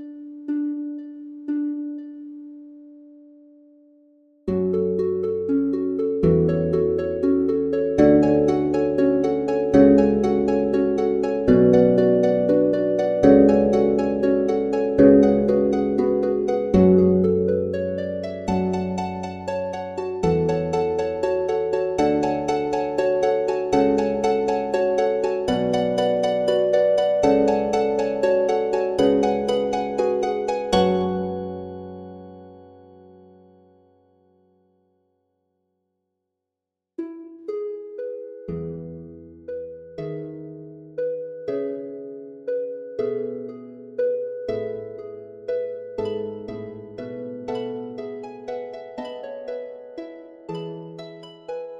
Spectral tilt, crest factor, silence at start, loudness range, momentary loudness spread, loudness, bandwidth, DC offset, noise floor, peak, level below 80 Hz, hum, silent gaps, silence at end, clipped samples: -7.5 dB/octave; 20 dB; 0 s; 16 LU; 19 LU; -21 LUFS; 9.8 kHz; under 0.1%; -85 dBFS; -2 dBFS; -48 dBFS; none; none; 0 s; under 0.1%